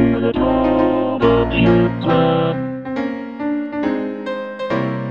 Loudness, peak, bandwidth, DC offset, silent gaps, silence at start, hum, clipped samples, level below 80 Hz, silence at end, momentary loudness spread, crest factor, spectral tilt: -18 LUFS; 0 dBFS; 6.8 kHz; under 0.1%; none; 0 s; none; under 0.1%; -36 dBFS; 0 s; 10 LU; 16 dB; -9 dB/octave